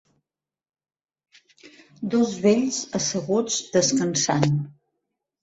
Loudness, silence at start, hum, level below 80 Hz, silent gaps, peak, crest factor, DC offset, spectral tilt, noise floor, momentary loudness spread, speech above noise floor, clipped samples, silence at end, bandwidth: -22 LUFS; 1.65 s; none; -62 dBFS; none; -4 dBFS; 20 dB; under 0.1%; -4.5 dB/octave; -90 dBFS; 6 LU; 68 dB; under 0.1%; 0.7 s; 8.4 kHz